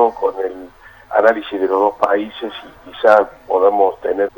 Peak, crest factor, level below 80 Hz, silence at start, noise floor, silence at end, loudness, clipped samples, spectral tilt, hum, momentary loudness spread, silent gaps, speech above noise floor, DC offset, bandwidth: 0 dBFS; 16 dB; -54 dBFS; 0 s; -40 dBFS; 0.1 s; -16 LUFS; under 0.1%; -5.5 dB/octave; none; 16 LU; none; 24 dB; under 0.1%; over 20 kHz